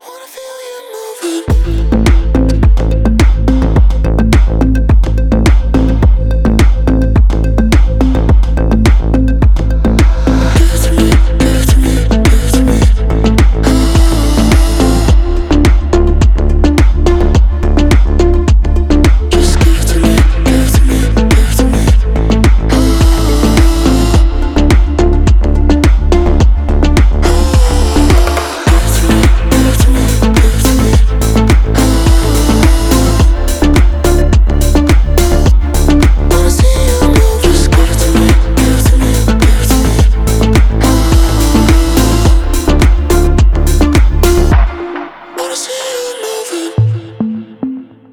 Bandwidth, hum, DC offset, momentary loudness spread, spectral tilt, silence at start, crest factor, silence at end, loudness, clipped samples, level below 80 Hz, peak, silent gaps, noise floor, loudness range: 16.5 kHz; none; under 0.1%; 4 LU; -6 dB/octave; 0.05 s; 8 dB; 0.3 s; -10 LUFS; under 0.1%; -10 dBFS; 0 dBFS; none; -29 dBFS; 1 LU